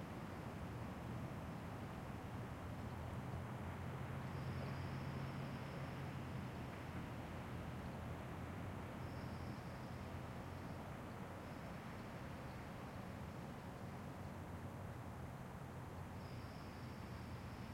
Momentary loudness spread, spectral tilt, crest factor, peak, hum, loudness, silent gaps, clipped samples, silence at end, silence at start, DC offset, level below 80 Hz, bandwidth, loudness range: 4 LU; -6.5 dB/octave; 14 dB; -36 dBFS; none; -50 LUFS; none; under 0.1%; 0 s; 0 s; under 0.1%; -62 dBFS; 16 kHz; 4 LU